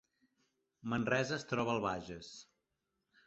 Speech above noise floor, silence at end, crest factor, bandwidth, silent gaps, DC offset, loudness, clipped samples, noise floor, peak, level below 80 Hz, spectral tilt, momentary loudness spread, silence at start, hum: 49 dB; 0.85 s; 22 dB; 8 kHz; none; under 0.1%; -36 LUFS; under 0.1%; -86 dBFS; -18 dBFS; -68 dBFS; -4.5 dB/octave; 16 LU; 0.85 s; none